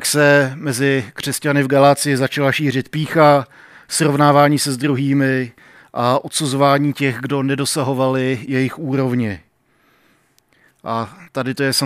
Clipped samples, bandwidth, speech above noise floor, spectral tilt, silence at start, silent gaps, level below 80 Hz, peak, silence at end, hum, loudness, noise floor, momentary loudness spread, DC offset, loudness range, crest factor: under 0.1%; 16 kHz; 42 dB; -5 dB/octave; 0 s; none; -62 dBFS; 0 dBFS; 0 s; none; -17 LUFS; -58 dBFS; 12 LU; under 0.1%; 7 LU; 18 dB